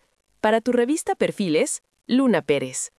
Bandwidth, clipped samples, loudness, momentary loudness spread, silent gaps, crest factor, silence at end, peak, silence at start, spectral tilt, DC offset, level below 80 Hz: 12 kHz; under 0.1%; -22 LUFS; 5 LU; none; 16 dB; 0.15 s; -6 dBFS; 0.45 s; -4 dB/octave; under 0.1%; -64 dBFS